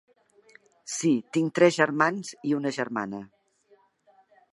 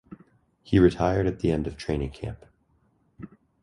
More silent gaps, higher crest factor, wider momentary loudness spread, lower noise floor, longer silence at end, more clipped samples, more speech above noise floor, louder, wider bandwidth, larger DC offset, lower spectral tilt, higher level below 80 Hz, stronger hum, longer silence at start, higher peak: neither; about the same, 24 dB vs 20 dB; second, 14 LU vs 25 LU; about the same, -63 dBFS vs -66 dBFS; first, 1.25 s vs 0.35 s; neither; second, 38 dB vs 42 dB; about the same, -26 LUFS vs -25 LUFS; about the same, 11.5 kHz vs 11.5 kHz; neither; second, -5 dB/octave vs -8 dB/octave; second, -76 dBFS vs -42 dBFS; neither; first, 0.85 s vs 0.1 s; about the same, -4 dBFS vs -6 dBFS